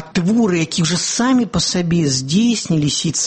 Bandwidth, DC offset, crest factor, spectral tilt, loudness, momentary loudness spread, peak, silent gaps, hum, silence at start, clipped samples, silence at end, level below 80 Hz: 8.8 kHz; under 0.1%; 12 dB; -4 dB/octave; -16 LUFS; 2 LU; -4 dBFS; none; none; 0 s; under 0.1%; 0 s; -44 dBFS